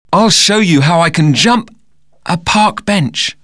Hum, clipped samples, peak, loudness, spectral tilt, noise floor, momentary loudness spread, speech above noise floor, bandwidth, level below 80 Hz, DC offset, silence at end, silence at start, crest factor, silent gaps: none; under 0.1%; 0 dBFS; -10 LUFS; -4 dB/octave; -57 dBFS; 8 LU; 46 dB; 11 kHz; -44 dBFS; 0.6%; 0.1 s; 0.1 s; 12 dB; none